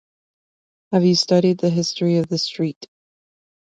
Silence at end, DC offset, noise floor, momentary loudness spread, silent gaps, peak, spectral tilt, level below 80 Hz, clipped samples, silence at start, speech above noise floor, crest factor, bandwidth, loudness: 0.95 s; under 0.1%; under -90 dBFS; 8 LU; 2.76-2.81 s; -4 dBFS; -6 dB/octave; -62 dBFS; under 0.1%; 0.9 s; over 72 dB; 16 dB; 7.8 kHz; -19 LUFS